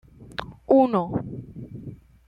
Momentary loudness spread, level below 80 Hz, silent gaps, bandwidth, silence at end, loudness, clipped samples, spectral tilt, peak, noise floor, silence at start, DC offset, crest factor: 21 LU; -52 dBFS; none; 5.8 kHz; 0.35 s; -22 LUFS; under 0.1%; -9 dB/octave; -8 dBFS; -42 dBFS; 0.2 s; under 0.1%; 18 dB